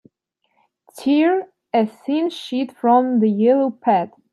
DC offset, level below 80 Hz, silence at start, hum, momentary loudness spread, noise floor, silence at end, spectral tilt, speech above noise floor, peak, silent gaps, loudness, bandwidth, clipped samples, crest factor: under 0.1%; -74 dBFS; 0.95 s; none; 8 LU; -70 dBFS; 0.25 s; -7 dB/octave; 53 dB; -4 dBFS; none; -19 LUFS; 12.5 kHz; under 0.1%; 14 dB